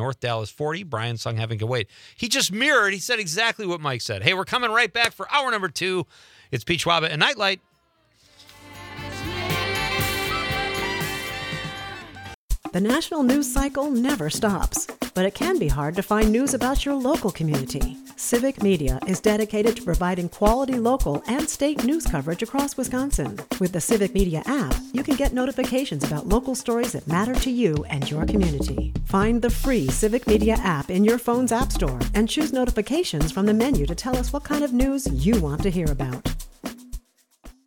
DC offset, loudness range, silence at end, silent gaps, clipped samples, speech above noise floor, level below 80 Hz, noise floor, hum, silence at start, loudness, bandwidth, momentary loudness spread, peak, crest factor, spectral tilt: under 0.1%; 4 LU; 0.15 s; 12.34-12.48 s; under 0.1%; 41 dB; -32 dBFS; -64 dBFS; none; 0 s; -23 LUFS; 19.5 kHz; 9 LU; 0 dBFS; 22 dB; -4.5 dB/octave